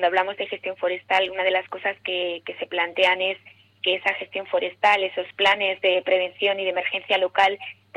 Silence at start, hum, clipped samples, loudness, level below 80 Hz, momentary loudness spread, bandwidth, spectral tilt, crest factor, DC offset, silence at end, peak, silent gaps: 0 s; none; under 0.1%; -23 LUFS; -72 dBFS; 9 LU; 9.8 kHz; -3 dB/octave; 18 dB; under 0.1%; 0.25 s; -6 dBFS; none